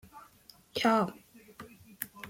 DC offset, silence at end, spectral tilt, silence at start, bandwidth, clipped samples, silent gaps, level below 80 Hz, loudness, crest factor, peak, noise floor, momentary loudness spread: under 0.1%; 0 s; -4.5 dB/octave; 0.15 s; 16.5 kHz; under 0.1%; none; -70 dBFS; -31 LUFS; 26 dB; -10 dBFS; -59 dBFS; 25 LU